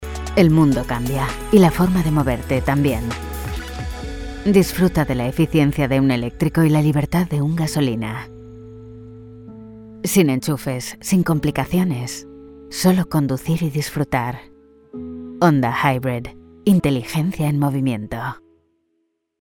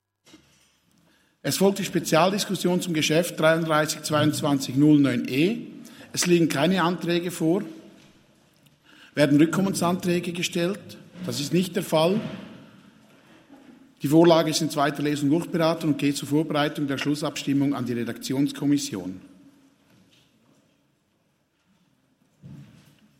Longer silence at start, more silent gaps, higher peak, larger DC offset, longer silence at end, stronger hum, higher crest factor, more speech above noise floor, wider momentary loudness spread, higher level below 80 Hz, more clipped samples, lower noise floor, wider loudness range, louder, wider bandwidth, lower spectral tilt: second, 0 s vs 1.45 s; neither; first, 0 dBFS vs -4 dBFS; neither; first, 1.05 s vs 0.55 s; neither; about the same, 18 dB vs 20 dB; first, 52 dB vs 46 dB; first, 20 LU vs 13 LU; first, -36 dBFS vs -66 dBFS; neither; about the same, -70 dBFS vs -69 dBFS; about the same, 5 LU vs 6 LU; first, -19 LUFS vs -23 LUFS; first, 19 kHz vs 16.5 kHz; first, -6.5 dB/octave vs -5 dB/octave